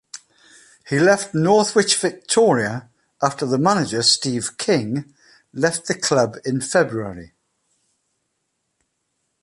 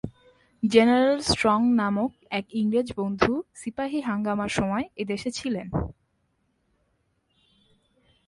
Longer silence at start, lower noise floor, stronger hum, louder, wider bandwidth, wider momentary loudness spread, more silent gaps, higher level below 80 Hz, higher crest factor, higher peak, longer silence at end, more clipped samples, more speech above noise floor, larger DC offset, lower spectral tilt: about the same, 0.15 s vs 0.05 s; about the same, -74 dBFS vs -71 dBFS; neither; first, -19 LUFS vs -25 LUFS; about the same, 11.5 kHz vs 11.5 kHz; about the same, 13 LU vs 12 LU; neither; second, -60 dBFS vs -50 dBFS; about the same, 18 dB vs 22 dB; first, -2 dBFS vs -6 dBFS; second, 2.15 s vs 2.35 s; neither; first, 55 dB vs 47 dB; neither; second, -3.5 dB/octave vs -5 dB/octave